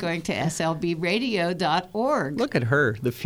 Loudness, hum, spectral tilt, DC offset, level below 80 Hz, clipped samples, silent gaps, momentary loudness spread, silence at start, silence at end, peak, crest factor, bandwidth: -24 LUFS; none; -5.5 dB/octave; under 0.1%; -56 dBFS; under 0.1%; none; 4 LU; 0 s; 0 s; -8 dBFS; 16 dB; over 20 kHz